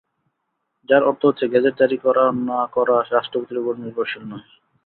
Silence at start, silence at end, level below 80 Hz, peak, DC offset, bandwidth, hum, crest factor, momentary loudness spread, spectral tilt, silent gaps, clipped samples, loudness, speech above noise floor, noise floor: 0.9 s; 0.45 s; -66 dBFS; -2 dBFS; under 0.1%; 4.4 kHz; none; 18 dB; 9 LU; -10.5 dB/octave; none; under 0.1%; -19 LUFS; 56 dB; -75 dBFS